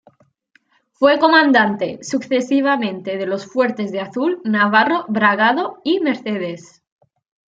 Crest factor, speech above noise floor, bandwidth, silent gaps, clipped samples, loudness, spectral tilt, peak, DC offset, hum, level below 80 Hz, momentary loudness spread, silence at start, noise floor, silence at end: 16 dB; 42 dB; 7.8 kHz; none; under 0.1%; -17 LUFS; -5 dB/octave; -2 dBFS; under 0.1%; none; -68 dBFS; 12 LU; 1 s; -59 dBFS; 0.85 s